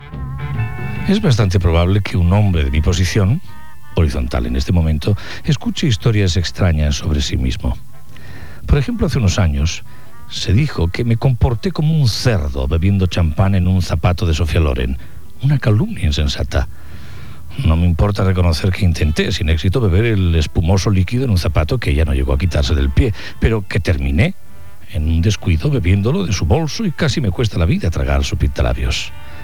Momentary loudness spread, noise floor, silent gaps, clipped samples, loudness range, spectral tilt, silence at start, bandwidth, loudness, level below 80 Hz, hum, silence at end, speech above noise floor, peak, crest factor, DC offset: 8 LU; -40 dBFS; none; under 0.1%; 3 LU; -6 dB/octave; 0 s; 14 kHz; -17 LUFS; -22 dBFS; none; 0 s; 25 dB; 0 dBFS; 16 dB; 5%